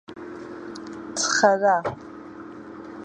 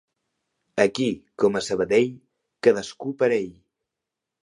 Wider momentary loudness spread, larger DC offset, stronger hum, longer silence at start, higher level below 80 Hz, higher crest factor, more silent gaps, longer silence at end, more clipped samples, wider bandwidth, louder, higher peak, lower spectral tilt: first, 22 LU vs 8 LU; neither; neither; second, 0.1 s vs 0.75 s; about the same, -62 dBFS vs -62 dBFS; about the same, 22 dB vs 20 dB; neither; second, 0 s vs 0.95 s; neither; about the same, 11 kHz vs 11 kHz; about the same, -21 LUFS vs -23 LUFS; about the same, -4 dBFS vs -4 dBFS; second, -2.5 dB/octave vs -5 dB/octave